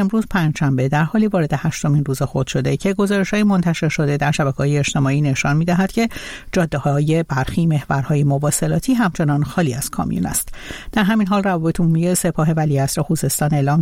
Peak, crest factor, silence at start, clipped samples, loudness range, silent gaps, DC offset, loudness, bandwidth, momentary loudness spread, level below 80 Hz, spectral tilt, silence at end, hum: -4 dBFS; 12 dB; 0 s; under 0.1%; 1 LU; none; under 0.1%; -18 LUFS; 16.5 kHz; 4 LU; -40 dBFS; -6 dB/octave; 0 s; none